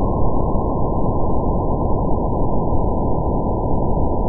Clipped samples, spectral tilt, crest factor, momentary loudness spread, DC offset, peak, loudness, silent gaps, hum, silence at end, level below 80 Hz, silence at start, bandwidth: under 0.1%; -17.5 dB/octave; 12 dB; 0 LU; under 0.1%; -4 dBFS; -21 LUFS; none; none; 0 s; -22 dBFS; 0 s; 1.1 kHz